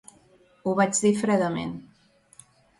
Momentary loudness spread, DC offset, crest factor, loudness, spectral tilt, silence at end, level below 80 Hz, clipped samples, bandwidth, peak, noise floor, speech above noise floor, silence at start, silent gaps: 13 LU; under 0.1%; 18 dB; -24 LUFS; -5 dB/octave; 1 s; -64 dBFS; under 0.1%; 11.5 kHz; -8 dBFS; -60 dBFS; 36 dB; 0.65 s; none